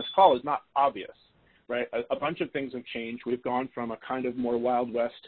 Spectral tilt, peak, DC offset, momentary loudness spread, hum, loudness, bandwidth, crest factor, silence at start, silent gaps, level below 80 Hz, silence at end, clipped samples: -9 dB/octave; -6 dBFS; under 0.1%; 13 LU; none; -29 LUFS; 4.5 kHz; 22 dB; 0 s; none; -66 dBFS; 0 s; under 0.1%